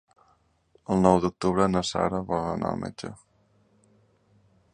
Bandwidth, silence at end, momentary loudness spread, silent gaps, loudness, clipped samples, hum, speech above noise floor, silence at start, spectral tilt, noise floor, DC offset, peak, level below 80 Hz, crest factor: 10 kHz; 1.6 s; 17 LU; none; -25 LUFS; under 0.1%; none; 41 dB; 0.9 s; -6.5 dB/octave; -66 dBFS; under 0.1%; -4 dBFS; -52 dBFS; 24 dB